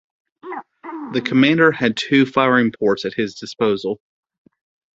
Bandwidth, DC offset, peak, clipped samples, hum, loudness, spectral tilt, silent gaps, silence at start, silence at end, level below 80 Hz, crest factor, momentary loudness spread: 7.8 kHz; under 0.1%; -2 dBFS; under 0.1%; none; -18 LUFS; -6 dB/octave; none; 0.45 s; 1 s; -60 dBFS; 18 dB; 18 LU